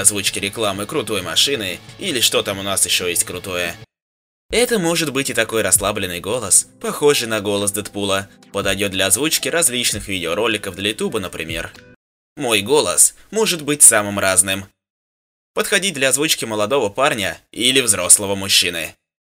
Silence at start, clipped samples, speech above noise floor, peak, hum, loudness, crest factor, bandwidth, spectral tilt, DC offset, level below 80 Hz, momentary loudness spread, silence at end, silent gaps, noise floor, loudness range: 0 s; under 0.1%; over 72 dB; 0 dBFS; none; -16 LUFS; 18 dB; 16 kHz; -1.5 dB/octave; under 0.1%; -50 dBFS; 11 LU; 0.45 s; 4.02-4.49 s, 11.96-12.36 s, 14.90-15.54 s; under -90 dBFS; 5 LU